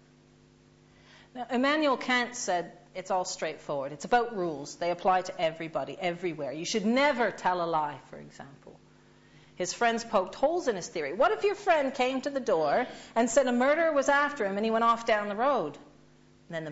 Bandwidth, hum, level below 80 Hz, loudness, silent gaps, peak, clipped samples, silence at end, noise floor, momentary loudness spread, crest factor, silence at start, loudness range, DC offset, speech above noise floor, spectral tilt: 8 kHz; none; -66 dBFS; -28 LUFS; none; -12 dBFS; under 0.1%; 0 s; -59 dBFS; 11 LU; 18 dB; 1.35 s; 5 LU; under 0.1%; 31 dB; -3.5 dB/octave